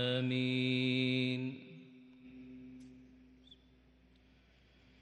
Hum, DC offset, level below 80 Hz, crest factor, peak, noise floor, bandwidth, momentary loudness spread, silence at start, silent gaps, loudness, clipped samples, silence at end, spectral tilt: none; under 0.1%; -72 dBFS; 18 dB; -20 dBFS; -66 dBFS; 9.2 kHz; 24 LU; 0 s; none; -34 LUFS; under 0.1%; 1.95 s; -7 dB/octave